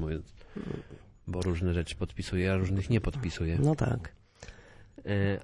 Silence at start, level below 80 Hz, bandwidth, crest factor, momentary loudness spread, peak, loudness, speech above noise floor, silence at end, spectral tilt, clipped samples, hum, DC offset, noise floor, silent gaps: 0 s; -46 dBFS; 11.5 kHz; 18 dB; 20 LU; -14 dBFS; -32 LUFS; 22 dB; 0 s; -7 dB/octave; under 0.1%; none; under 0.1%; -52 dBFS; none